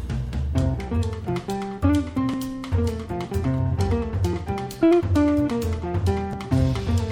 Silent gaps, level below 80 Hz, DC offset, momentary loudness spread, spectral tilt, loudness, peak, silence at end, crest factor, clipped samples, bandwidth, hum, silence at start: none; -32 dBFS; under 0.1%; 9 LU; -7.5 dB/octave; -24 LUFS; -8 dBFS; 0 s; 14 dB; under 0.1%; 16.5 kHz; none; 0 s